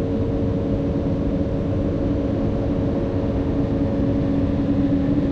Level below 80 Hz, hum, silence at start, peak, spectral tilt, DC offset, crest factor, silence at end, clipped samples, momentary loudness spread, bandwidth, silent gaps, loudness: -30 dBFS; none; 0 s; -8 dBFS; -10 dB/octave; under 0.1%; 12 dB; 0 s; under 0.1%; 3 LU; 6.6 kHz; none; -22 LUFS